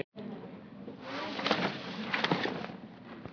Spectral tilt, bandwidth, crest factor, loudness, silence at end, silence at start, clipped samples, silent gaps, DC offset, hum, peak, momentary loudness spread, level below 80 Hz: -5 dB/octave; 5.4 kHz; 24 dB; -34 LUFS; 0 s; 0 s; under 0.1%; 0.04-0.12 s; under 0.1%; none; -12 dBFS; 17 LU; -72 dBFS